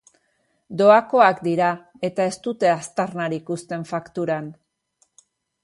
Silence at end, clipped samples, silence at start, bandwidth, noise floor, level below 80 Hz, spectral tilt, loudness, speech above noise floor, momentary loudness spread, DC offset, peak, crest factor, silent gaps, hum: 1.1 s; under 0.1%; 0.7 s; 11.5 kHz; -68 dBFS; -68 dBFS; -5.5 dB/octave; -21 LUFS; 48 dB; 14 LU; under 0.1%; -2 dBFS; 20 dB; none; none